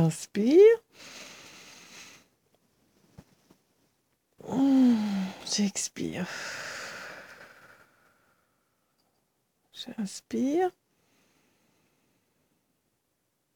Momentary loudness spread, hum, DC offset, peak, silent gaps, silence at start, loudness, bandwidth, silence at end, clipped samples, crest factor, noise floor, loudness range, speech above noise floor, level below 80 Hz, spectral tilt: 27 LU; none; under 0.1%; -10 dBFS; none; 0 s; -26 LUFS; 18 kHz; 2.85 s; under 0.1%; 20 dB; -77 dBFS; 18 LU; 53 dB; -74 dBFS; -5 dB/octave